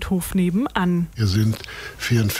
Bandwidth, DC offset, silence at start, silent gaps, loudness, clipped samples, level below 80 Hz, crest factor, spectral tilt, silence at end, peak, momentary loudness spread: 16 kHz; under 0.1%; 0 s; none; -22 LUFS; under 0.1%; -40 dBFS; 18 dB; -6 dB/octave; 0 s; -4 dBFS; 8 LU